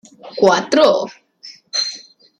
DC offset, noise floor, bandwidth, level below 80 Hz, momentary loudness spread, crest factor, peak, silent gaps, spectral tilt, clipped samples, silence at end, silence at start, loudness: under 0.1%; -42 dBFS; 10.5 kHz; -66 dBFS; 18 LU; 16 dB; -2 dBFS; none; -3 dB/octave; under 0.1%; 0.4 s; 0.25 s; -16 LUFS